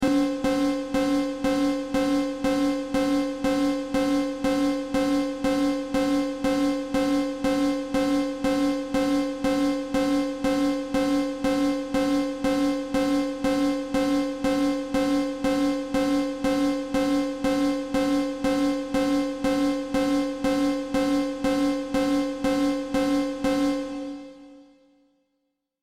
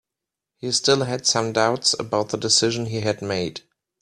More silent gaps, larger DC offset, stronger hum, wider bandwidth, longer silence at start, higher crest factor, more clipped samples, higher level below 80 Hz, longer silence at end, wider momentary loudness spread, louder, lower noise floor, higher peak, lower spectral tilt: neither; neither; neither; first, 15 kHz vs 13 kHz; second, 0 s vs 0.65 s; second, 10 dB vs 20 dB; neither; first, -46 dBFS vs -60 dBFS; first, 1.2 s vs 0.4 s; second, 2 LU vs 9 LU; second, -25 LUFS vs -21 LUFS; second, -77 dBFS vs -86 dBFS; second, -14 dBFS vs -4 dBFS; first, -5 dB/octave vs -3 dB/octave